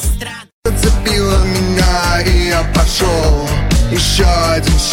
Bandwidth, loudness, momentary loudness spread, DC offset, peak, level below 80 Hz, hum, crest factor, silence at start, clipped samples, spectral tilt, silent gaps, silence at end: 17 kHz; -13 LUFS; 6 LU; under 0.1%; -2 dBFS; -16 dBFS; none; 10 dB; 0 s; under 0.1%; -4.5 dB/octave; 0.53-0.62 s; 0 s